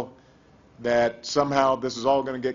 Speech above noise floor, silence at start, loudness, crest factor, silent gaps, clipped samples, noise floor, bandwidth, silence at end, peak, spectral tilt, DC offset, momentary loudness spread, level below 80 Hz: 32 dB; 0 s; -24 LUFS; 20 dB; none; under 0.1%; -55 dBFS; 7.6 kHz; 0 s; -6 dBFS; -4.5 dB/octave; under 0.1%; 6 LU; -58 dBFS